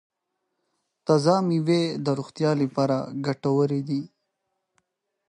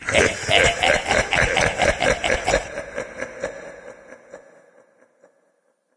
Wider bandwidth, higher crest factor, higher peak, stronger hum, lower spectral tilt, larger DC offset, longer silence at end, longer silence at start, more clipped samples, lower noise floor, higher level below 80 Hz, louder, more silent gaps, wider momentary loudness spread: about the same, 10.5 kHz vs 10.5 kHz; about the same, 20 dB vs 22 dB; second, -6 dBFS vs 0 dBFS; neither; first, -7 dB/octave vs -2.5 dB/octave; neither; second, 1.2 s vs 1.6 s; first, 1.05 s vs 0 s; neither; first, -79 dBFS vs -66 dBFS; second, -72 dBFS vs -38 dBFS; second, -24 LUFS vs -19 LUFS; neither; second, 9 LU vs 15 LU